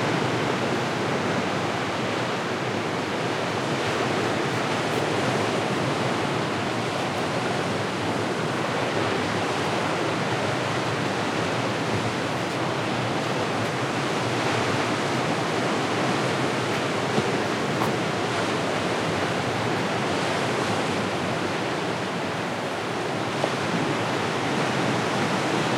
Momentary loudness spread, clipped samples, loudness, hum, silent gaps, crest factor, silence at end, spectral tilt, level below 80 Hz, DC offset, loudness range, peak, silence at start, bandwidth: 2 LU; under 0.1%; -25 LUFS; none; none; 18 dB; 0 s; -4.5 dB/octave; -62 dBFS; under 0.1%; 1 LU; -8 dBFS; 0 s; 16.5 kHz